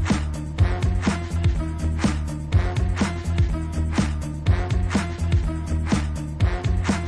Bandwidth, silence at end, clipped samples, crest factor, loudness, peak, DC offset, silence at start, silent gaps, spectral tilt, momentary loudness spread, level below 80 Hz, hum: 11 kHz; 0 s; under 0.1%; 14 dB; -24 LUFS; -8 dBFS; under 0.1%; 0 s; none; -6.5 dB/octave; 4 LU; -26 dBFS; none